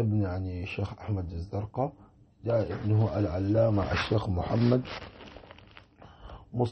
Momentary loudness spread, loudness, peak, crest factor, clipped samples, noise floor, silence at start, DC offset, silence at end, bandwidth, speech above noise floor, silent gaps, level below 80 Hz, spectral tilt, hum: 21 LU; -30 LUFS; -14 dBFS; 16 dB; under 0.1%; -54 dBFS; 0 s; under 0.1%; 0 s; 6.2 kHz; 25 dB; none; -48 dBFS; -8.5 dB/octave; none